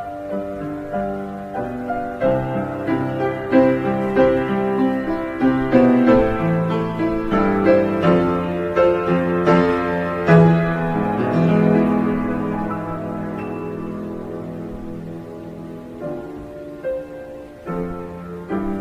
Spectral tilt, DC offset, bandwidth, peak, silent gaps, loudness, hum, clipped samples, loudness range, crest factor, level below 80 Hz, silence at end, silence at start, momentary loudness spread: -9 dB/octave; under 0.1%; 7.6 kHz; -2 dBFS; none; -19 LUFS; none; under 0.1%; 14 LU; 18 dB; -42 dBFS; 0 s; 0 s; 16 LU